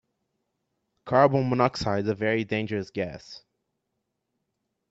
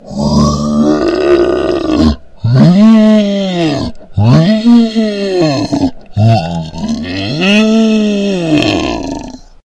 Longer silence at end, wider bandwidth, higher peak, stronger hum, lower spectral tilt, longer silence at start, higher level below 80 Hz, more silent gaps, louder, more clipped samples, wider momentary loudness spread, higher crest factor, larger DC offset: first, 1.5 s vs 0.25 s; second, 8 kHz vs 9 kHz; second, -6 dBFS vs 0 dBFS; neither; about the same, -7 dB/octave vs -6.5 dB/octave; first, 1.05 s vs 0.05 s; second, -60 dBFS vs -30 dBFS; neither; second, -25 LUFS vs -10 LUFS; neither; about the same, 13 LU vs 11 LU; first, 22 dB vs 10 dB; neither